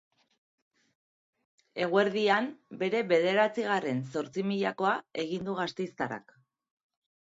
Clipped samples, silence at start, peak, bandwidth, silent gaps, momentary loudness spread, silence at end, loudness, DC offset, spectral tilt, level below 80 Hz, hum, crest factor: under 0.1%; 1.75 s; -10 dBFS; 7.8 kHz; none; 9 LU; 1.1 s; -30 LUFS; under 0.1%; -5.5 dB/octave; -76 dBFS; none; 20 dB